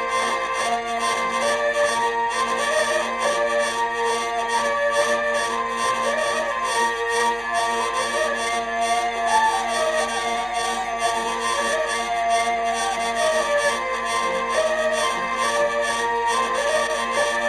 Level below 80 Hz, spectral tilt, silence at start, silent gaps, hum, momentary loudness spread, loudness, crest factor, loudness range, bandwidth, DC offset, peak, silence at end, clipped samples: -52 dBFS; -1 dB/octave; 0 s; none; none; 3 LU; -21 LUFS; 14 dB; 1 LU; 14 kHz; under 0.1%; -8 dBFS; 0 s; under 0.1%